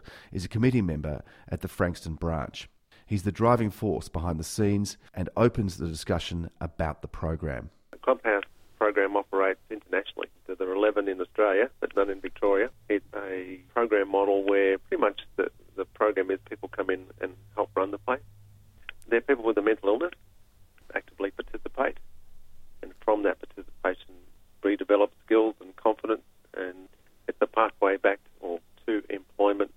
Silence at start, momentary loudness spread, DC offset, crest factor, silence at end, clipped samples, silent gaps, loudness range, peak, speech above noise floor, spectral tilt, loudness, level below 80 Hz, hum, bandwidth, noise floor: 0.05 s; 13 LU; under 0.1%; 22 dB; 0.1 s; under 0.1%; none; 4 LU; -6 dBFS; 28 dB; -6.5 dB/octave; -28 LUFS; -48 dBFS; none; 16 kHz; -55 dBFS